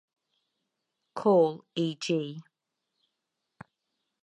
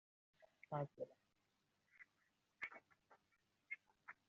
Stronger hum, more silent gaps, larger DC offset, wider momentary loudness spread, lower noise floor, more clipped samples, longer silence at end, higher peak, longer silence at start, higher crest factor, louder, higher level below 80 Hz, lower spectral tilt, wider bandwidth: neither; neither; neither; about the same, 18 LU vs 18 LU; about the same, -84 dBFS vs -85 dBFS; neither; first, 1.8 s vs 0.15 s; first, -12 dBFS vs -32 dBFS; first, 1.15 s vs 0.4 s; about the same, 20 dB vs 24 dB; first, -28 LUFS vs -52 LUFS; first, -82 dBFS vs under -90 dBFS; about the same, -6 dB/octave vs -5.5 dB/octave; first, 10.5 kHz vs 7 kHz